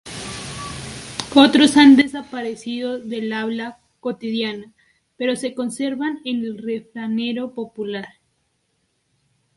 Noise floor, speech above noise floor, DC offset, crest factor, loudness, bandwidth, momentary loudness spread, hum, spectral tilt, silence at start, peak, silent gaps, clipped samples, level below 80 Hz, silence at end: -69 dBFS; 50 dB; under 0.1%; 20 dB; -20 LUFS; 11.5 kHz; 19 LU; none; -4 dB/octave; 0.05 s; 0 dBFS; none; under 0.1%; -54 dBFS; 1.5 s